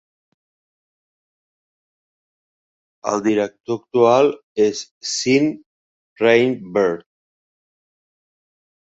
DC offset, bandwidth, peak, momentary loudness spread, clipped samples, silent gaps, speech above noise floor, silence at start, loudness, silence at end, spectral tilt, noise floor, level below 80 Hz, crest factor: under 0.1%; 8.2 kHz; -2 dBFS; 13 LU; under 0.1%; 4.43-4.55 s, 4.91-5.01 s, 5.66-6.16 s; over 72 dB; 3.05 s; -18 LUFS; 1.85 s; -4.5 dB/octave; under -90 dBFS; -66 dBFS; 20 dB